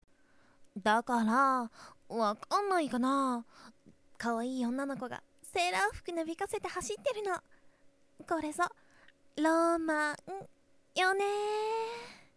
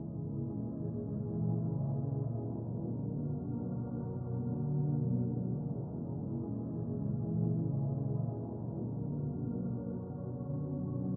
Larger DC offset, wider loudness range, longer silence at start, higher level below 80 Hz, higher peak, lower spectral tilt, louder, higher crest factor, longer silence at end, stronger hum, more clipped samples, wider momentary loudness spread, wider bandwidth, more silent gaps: neither; first, 5 LU vs 1 LU; first, 0.6 s vs 0 s; second, -66 dBFS vs -58 dBFS; first, -16 dBFS vs -22 dBFS; second, -3.5 dB/octave vs -14 dB/octave; first, -33 LUFS vs -37 LUFS; about the same, 18 dB vs 14 dB; first, 0.2 s vs 0 s; neither; neither; first, 12 LU vs 6 LU; first, 11 kHz vs 1.6 kHz; neither